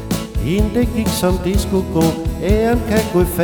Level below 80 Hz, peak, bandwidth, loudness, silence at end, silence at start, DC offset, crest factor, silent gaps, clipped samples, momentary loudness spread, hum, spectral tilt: -24 dBFS; -2 dBFS; over 20 kHz; -17 LUFS; 0 s; 0 s; under 0.1%; 14 dB; none; under 0.1%; 4 LU; none; -6 dB/octave